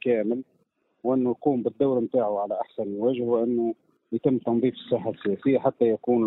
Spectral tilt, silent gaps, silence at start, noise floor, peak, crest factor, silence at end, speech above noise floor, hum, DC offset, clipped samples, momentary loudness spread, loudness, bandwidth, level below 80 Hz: -11.5 dB/octave; none; 0.05 s; -51 dBFS; -8 dBFS; 16 dB; 0 s; 26 dB; none; under 0.1%; under 0.1%; 7 LU; -26 LUFS; 4.1 kHz; -66 dBFS